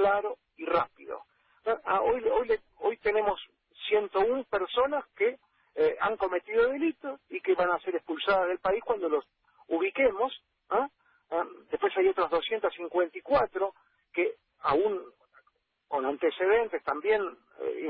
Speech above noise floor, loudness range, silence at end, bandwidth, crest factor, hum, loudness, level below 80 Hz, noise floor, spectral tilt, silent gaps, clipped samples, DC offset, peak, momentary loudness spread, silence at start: 45 dB; 2 LU; 0 s; 5.4 kHz; 16 dB; none; -29 LUFS; -62 dBFS; -73 dBFS; -8 dB/octave; none; under 0.1%; under 0.1%; -14 dBFS; 10 LU; 0 s